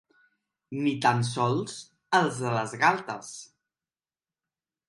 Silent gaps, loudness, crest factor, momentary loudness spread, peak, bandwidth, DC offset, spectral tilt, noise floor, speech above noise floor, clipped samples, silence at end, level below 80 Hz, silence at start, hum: none; -27 LUFS; 22 dB; 15 LU; -8 dBFS; 11.5 kHz; under 0.1%; -5 dB/octave; under -90 dBFS; over 63 dB; under 0.1%; 1.45 s; -72 dBFS; 0.7 s; none